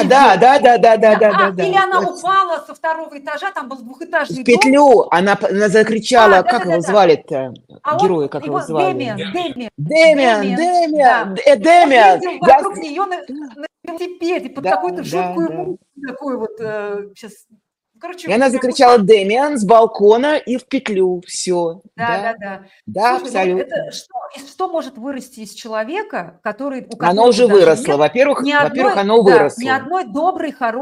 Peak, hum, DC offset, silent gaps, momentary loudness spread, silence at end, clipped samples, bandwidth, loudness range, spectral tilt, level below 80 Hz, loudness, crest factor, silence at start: 0 dBFS; none; under 0.1%; none; 18 LU; 0 s; under 0.1%; 13 kHz; 10 LU; -4.5 dB/octave; -58 dBFS; -14 LUFS; 14 dB; 0 s